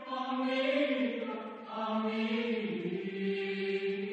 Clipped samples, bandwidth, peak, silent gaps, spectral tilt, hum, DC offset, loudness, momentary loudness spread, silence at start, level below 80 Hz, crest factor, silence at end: under 0.1%; 8.4 kHz; -18 dBFS; none; -7 dB/octave; none; under 0.1%; -34 LUFS; 8 LU; 0 s; -86 dBFS; 16 dB; 0 s